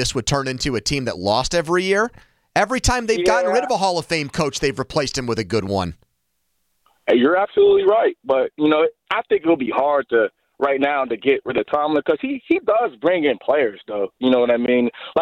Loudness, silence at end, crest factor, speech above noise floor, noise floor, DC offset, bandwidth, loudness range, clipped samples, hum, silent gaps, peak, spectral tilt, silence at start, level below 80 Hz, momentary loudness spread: -19 LUFS; 0 s; 14 dB; 53 dB; -72 dBFS; under 0.1%; 14 kHz; 4 LU; under 0.1%; none; none; -4 dBFS; -4.5 dB/octave; 0 s; -40 dBFS; 6 LU